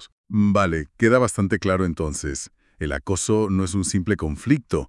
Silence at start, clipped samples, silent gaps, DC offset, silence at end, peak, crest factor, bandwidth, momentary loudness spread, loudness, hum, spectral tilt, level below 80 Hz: 0 s; under 0.1%; 0.12-0.24 s; under 0.1%; 0 s; -4 dBFS; 18 dB; 12 kHz; 10 LU; -22 LUFS; none; -5.5 dB/octave; -42 dBFS